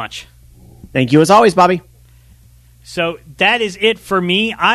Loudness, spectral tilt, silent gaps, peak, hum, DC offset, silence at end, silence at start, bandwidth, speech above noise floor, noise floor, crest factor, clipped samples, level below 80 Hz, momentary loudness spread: -13 LUFS; -5 dB/octave; none; 0 dBFS; 60 Hz at -45 dBFS; under 0.1%; 0 s; 0 s; 13.5 kHz; 32 dB; -46 dBFS; 16 dB; under 0.1%; -48 dBFS; 13 LU